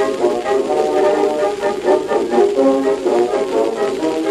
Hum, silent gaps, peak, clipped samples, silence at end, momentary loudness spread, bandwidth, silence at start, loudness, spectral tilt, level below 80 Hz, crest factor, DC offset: none; none; -2 dBFS; under 0.1%; 0 s; 4 LU; 13 kHz; 0 s; -16 LUFS; -4.5 dB/octave; -52 dBFS; 12 dB; under 0.1%